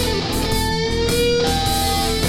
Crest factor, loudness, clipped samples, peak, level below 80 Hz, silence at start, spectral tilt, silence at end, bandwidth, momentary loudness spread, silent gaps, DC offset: 14 dB; -19 LUFS; under 0.1%; -6 dBFS; -28 dBFS; 0 s; -4 dB/octave; 0 s; 17 kHz; 3 LU; none; under 0.1%